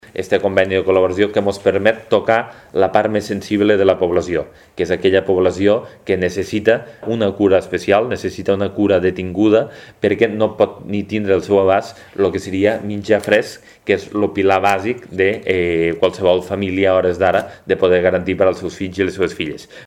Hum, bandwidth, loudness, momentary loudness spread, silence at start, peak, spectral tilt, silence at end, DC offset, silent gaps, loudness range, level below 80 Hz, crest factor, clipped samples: none; 14.5 kHz; -17 LUFS; 7 LU; 0.15 s; 0 dBFS; -6 dB/octave; 0 s; under 0.1%; none; 1 LU; -50 dBFS; 16 dB; under 0.1%